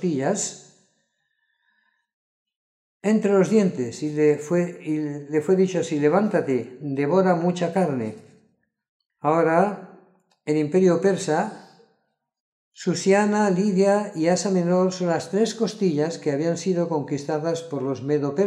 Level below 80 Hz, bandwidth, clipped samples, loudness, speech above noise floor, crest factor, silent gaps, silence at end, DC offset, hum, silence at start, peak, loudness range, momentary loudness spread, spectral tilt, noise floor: -76 dBFS; 11 kHz; under 0.1%; -22 LUFS; 51 dB; 18 dB; 2.14-2.46 s, 2.56-3.00 s, 8.89-9.00 s, 9.06-9.10 s, 12.40-12.72 s; 0 s; under 0.1%; none; 0 s; -6 dBFS; 4 LU; 8 LU; -6 dB/octave; -73 dBFS